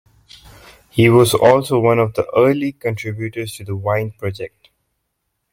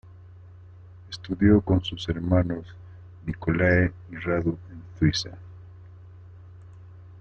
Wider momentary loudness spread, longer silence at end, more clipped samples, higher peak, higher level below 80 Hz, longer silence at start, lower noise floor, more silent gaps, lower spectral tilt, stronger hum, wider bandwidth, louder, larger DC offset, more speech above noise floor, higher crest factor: second, 15 LU vs 25 LU; first, 1.05 s vs 0 s; neither; first, -2 dBFS vs -6 dBFS; second, -52 dBFS vs -46 dBFS; first, 0.95 s vs 0.05 s; first, -73 dBFS vs -47 dBFS; neither; about the same, -6 dB/octave vs -6.5 dB/octave; neither; first, 16.5 kHz vs 7.4 kHz; first, -16 LUFS vs -25 LUFS; neither; first, 57 dB vs 22 dB; about the same, 16 dB vs 20 dB